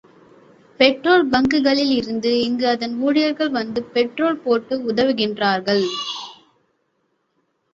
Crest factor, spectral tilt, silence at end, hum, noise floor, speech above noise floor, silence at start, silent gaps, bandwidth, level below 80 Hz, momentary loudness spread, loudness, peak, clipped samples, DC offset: 18 dB; -5 dB/octave; 1.4 s; none; -69 dBFS; 50 dB; 0.8 s; none; 7.6 kHz; -56 dBFS; 7 LU; -19 LUFS; -2 dBFS; under 0.1%; under 0.1%